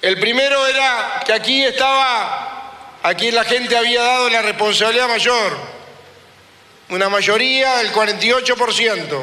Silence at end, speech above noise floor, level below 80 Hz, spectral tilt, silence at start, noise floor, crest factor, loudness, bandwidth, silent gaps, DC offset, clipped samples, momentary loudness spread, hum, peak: 0 s; 30 dB; -58 dBFS; -1.5 dB/octave; 0 s; -46 dBFS; 16 dB; -15 LUFS; 14.5 kHz; none; under 0.1%; under 0.1%; 8 LU; none; -2 dBFS